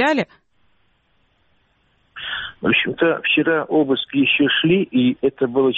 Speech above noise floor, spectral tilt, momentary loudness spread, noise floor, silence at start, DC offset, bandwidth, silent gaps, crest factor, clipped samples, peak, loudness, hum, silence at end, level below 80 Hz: 47 dB; -3 dB/octave; 11 LU; -64 dBFS; 0 s; under 0.1%; 7.6 kHz; none; 16 dB; under 0.1%; -4 dBFS; -18 LUFS; none; 0 s; -58 dBFS